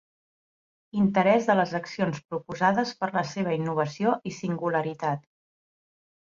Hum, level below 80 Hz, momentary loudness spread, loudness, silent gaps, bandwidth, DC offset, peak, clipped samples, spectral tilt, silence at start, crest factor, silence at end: none; -66 dBFS; 10 LU; -26 LUFS; none; 7.6 kHz; under 0.1%; -8 dBFS; under 0.1%; -6.5 dB/octave; 0.95 s; 18 dB; 1.2 s